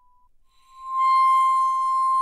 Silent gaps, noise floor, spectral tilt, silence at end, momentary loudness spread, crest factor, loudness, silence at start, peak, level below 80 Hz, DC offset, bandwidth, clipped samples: none; -57 dBFS; 3.5 dB/octave; 0 s; 11 LU; 8 dB; -20 LUFS; 0.8 s; -12 dBFS; -66 dBFS; under 0.1%; 12.5 kHz; under 0.1%